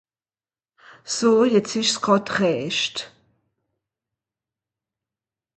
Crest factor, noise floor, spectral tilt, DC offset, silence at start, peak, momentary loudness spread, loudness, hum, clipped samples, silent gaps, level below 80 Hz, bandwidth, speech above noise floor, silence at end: 20 dB; under -90 dBFS; -3.5 dB/octave; under 0.1%; 1.05 s; -4 dBFS; 11 LU; -20 LUFS; none; under 0.1%; none; -68 dBFS; 9.2 kHz; over 70 dB; 2.5 s